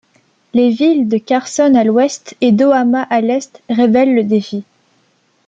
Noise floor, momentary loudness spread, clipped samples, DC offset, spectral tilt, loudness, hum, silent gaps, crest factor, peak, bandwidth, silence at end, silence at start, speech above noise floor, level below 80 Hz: -58 dBFS; 8 LU; under 0.1%; under 0.1%; -5.5 dB/octave; -13 LUFS; none; none; 12 dB; -2 dBFS; 9 kHz; 0.85 s; 0.55 s; 45 dB; -60 dBFS